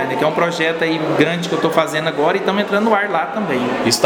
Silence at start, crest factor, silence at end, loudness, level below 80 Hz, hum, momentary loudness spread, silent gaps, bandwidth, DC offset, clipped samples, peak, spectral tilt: 0 s; 16 dB; 0 s; -17 LUFS; -58 dBFS; none; 3 LU; none; over 20 kHz; under 0.1%; under 0.1%; 0 dBFS; -4.5 dB/octave